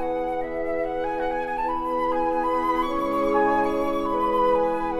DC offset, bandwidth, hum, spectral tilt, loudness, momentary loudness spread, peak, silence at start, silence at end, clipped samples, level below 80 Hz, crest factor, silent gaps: under 0.1%; 15 kHz; none; -6 dB/octave; -24 LUFS; 6 LU; -10 dBFS; 0 s; 0 s; under 0.1%; -44 dBFS; 14 dB; none